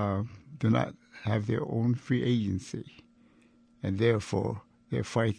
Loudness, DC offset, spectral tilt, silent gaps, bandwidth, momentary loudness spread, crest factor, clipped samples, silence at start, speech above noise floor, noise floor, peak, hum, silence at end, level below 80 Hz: -31 LUFS; under 0.1%; -7.5 dB/octave; none; 10 kHz; 13 LU; 18 dB; under 0.1%; 0 s; 33 dB; -62 dBFS; -12 dBFS; none; 0 s; -60 dBFS